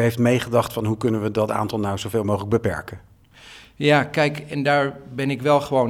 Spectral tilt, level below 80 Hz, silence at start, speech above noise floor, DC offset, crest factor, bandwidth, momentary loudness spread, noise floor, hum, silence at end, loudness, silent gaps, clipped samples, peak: -6 dB/octave; -52 dBFS; 0 s; 25 dB; under 0.1%; 18 dB; 16.5 kHz; 8 LU; -46 dBFS; none; 0 s; -22 LUFS; none; under 0.1%; -2 dBFS